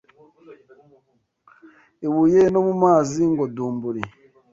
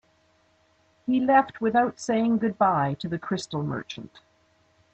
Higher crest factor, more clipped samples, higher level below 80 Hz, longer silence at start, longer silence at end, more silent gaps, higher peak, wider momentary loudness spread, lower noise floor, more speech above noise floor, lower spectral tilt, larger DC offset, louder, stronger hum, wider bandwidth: about the same, 18 dB vs 18 dB; neither; first, -58 dBFS vs -66 dBFS; second, 0.5 s vs 1.05 s; second, 0.45 s vs 0.9 s; neither; first, -4 dBFS vs -8 dBFS; about the same, 14 LU vs 13 LU; about the same, -66 dBFS vs -64 dBFS; first, 48 dB vs 40 dB; first, -7.5 dB/octave vs -6 dB/octave; neither; first, -20 LUFS vs -25 LUFS; neither; second, 7.8 kHz vs 8.6 kHz